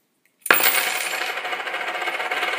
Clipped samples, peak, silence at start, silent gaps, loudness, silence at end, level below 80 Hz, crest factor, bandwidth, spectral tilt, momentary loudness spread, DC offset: under 0.1%; 0 dBFS; 0.45 s; none; -21 LUFS; 0 s; -76 dBFS; 24 dB; 16 kHz; 0.5 dB/octave; 11 LU; under 0.1%